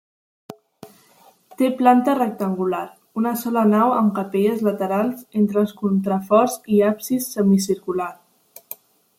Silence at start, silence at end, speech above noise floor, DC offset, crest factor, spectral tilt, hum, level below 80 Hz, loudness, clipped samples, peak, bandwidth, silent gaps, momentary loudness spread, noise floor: 0.5 s; 0.45 s; 35 dB; under 0.1%; 20 dB; -6.5 dB/octave; none; -68 dBFS; -20 LUFS; under 0.1%; -2 dBFS; 16.5 kHz; none; 10 LU; -54 dBFS